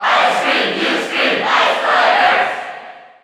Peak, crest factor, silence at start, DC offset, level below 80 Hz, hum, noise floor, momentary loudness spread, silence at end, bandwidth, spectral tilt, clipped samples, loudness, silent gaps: -2 dBFS; 14 dB; 0 s; under 0.1%; -64 dBFS; none; -35 dBFS; 10 LU; 0.2 s; 14.5 kHz; -2.5 dB/octave; under 0.1%; -14 LUFS; none